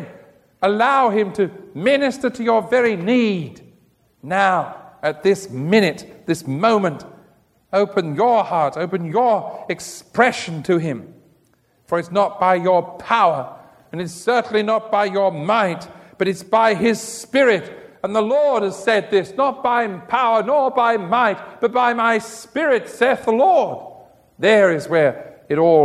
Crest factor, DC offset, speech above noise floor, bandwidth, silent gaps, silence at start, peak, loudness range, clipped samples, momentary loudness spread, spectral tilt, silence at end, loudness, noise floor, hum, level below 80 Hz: 18 dB; under 0.1%; 42 dB; 14 kHz; none; 0 s; 0 dBFS; 3 LU; under 0.1%; 11 LU; -5.5 dB/octave; 0 s; -18 LUFS; -60 dBFS; none; -62 dBFS